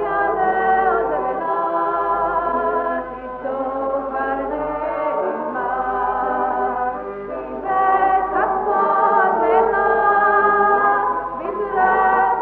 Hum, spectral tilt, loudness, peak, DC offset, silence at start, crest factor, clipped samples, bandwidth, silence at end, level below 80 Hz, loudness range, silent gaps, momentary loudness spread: none; -8.5 dB/octave; -19 LUFS; -4 dBFS; under 0.1%; 0 s; 14 dB; under 0.1%; 4.4 kHz; 0 s; -46 dBFS; 6 LU; none; 9 LU